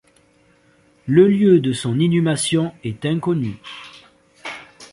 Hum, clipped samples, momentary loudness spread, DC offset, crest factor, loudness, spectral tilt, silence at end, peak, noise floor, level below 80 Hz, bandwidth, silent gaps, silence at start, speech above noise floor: none; under 0.1%; 21 LU; under 0.1%; 18 dB; -18 LUFS; -6 dB/octave; 0.05 s; -2 dBFS; -56 dBFS; -56 dBFS; 11.5 kHz; none; 1.05 s; 39 dB